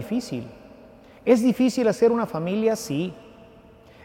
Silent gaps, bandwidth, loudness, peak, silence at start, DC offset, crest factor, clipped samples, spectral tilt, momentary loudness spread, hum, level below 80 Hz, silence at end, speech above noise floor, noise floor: none; 16.5 kHz; -23 LUFS; -6 dBFS; 0 s; under 0.1%; 18 dB; under 0.1%; -6 dB/octave; 13 LU; none; -60 dBFS; 0.85 s; 28 dB; -50 dBFS